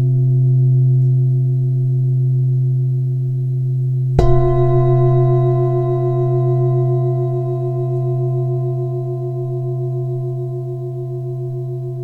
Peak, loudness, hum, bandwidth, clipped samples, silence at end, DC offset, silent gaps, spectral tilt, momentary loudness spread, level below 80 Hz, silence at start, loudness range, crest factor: 0 dBFS; -17 LUFS; none; 2.1 kHz; under 0.1%; 0 s; under 0.1%; none; -11.5 dB/octave; 10 LU; -32 dBFS; 0 s; 6 LU; 16 dB